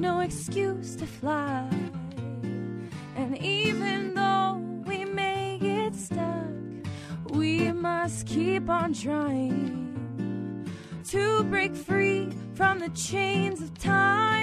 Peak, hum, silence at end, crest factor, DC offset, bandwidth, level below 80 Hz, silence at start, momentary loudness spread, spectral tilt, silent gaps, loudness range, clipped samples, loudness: -10 dBFS; none; 0 s; 18 dB; under 0.1%; 13.5 kHz; -56 dBFS; 0 s; 11 LU; -5 dB/octave; none; 3 LU; under 0.1%; -28 LUFS